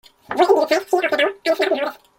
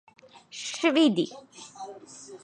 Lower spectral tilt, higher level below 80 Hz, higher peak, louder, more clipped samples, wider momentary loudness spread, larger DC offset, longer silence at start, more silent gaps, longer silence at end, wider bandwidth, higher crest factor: second, -2.5 dB/octave vs -4 dB/octave; first, -66 dBFS vs -80 dBFS; first, -2 dBFS vs -10 dBFS; first, -19 LUFS vs -25 LUFS; neither; second, 5 LU vs 23 LU; neither; second, 0.3 s vs 0.55 s; neither; first, 0.25 s vs 0.05 s; first, 17 kHz vs 10.5 kHz; about the same, 18 dB vs 20 dB